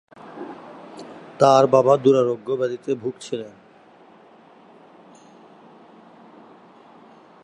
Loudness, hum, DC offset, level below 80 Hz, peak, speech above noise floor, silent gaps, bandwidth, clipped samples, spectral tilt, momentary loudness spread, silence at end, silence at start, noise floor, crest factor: -19 LUFS; none; under 0.1%; -74 dBFS; -2 dBFS; 32 dB; none; 10.5 kHz; under 0.1%; -6 dB/octave; 25 LU; 3.95 s; 0.25 s; -50 dBFS; 22 dB